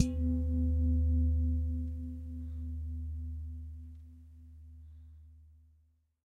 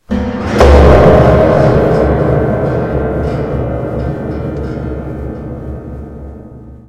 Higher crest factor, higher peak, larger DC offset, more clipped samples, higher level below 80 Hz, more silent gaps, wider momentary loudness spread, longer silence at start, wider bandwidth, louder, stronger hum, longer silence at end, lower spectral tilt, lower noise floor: first, 22 dB vs 12 dB; second, -12 dBFS vs 0 dBFS; neither; second, under 0.1% vs 1%; second, -36 dBFS vs -18 dBFS; neither; first, 24 LU vs 20 LU; about the same, 0 s vs 0.1 s; second, 7 kHz vs 9.6 kHz; second, -35 LUFS vs -11 LUFS; neither; first, 0.8 s vs 0.05 s; about the same, -8.5 dB/octave vs -8 dB/octave; first, -69 dBFS vs -32 dBFS